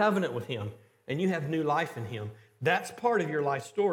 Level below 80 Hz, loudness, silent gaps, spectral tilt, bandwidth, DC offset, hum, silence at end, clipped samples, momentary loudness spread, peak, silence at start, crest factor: -78 dBFS; -30 LUFS; none; -6 dB/octave; 16.5 kHz; under 0.1%; none; 0 s; under 0.1%; 11 LU; -12 dBFS; 0 s; 18 dB